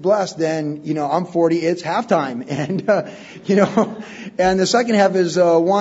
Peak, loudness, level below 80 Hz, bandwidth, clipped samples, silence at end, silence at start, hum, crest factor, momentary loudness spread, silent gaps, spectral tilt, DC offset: 0 dBFS; -18 LUFS; -54 dBFS; 8 kHz; under 0.1%; 0 s; 0 s; none; 16 dB; 9 LU; none; -5.5 dB/octave; under 0.1%